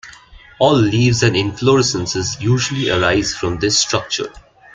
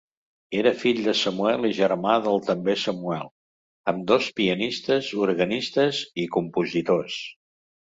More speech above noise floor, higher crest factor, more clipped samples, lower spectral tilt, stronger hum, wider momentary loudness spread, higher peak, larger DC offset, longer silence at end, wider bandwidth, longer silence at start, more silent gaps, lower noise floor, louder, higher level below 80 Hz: second, 26 dB vs over 67 dB; about the same, 16 dB vs 20 dB; neither; about the same, -4.5 dB/octave vs -5 dB/octave; neither; about the same, 7 LU vs 9 LU; first, 0 dBFS vs -4 dBFS; neither; second, 0.35 s vs 0.6 s; first, 9.4 kHz vs 8 kHz; second, 0.05 s vs 0.5 s; second, none vs 3.31-3.84 s; second, -42 dBFS vs under -90 dBFS; first, -16 LUFS vs -24 LUFS; first, -42 dBFS vs -64 dBFS